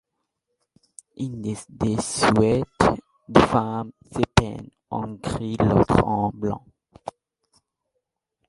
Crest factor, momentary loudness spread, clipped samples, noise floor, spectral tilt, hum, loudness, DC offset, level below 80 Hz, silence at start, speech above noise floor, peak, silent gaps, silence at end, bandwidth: 24 dB; 15 LU; under 0.1%; -79 dBFS; -6 dB/octave; none; -23 LUFS; under 0.1%; -40 dBFS; 1.2 s; 57 dB; 0 dBFS; none; 1.4 s; 11.5 kHz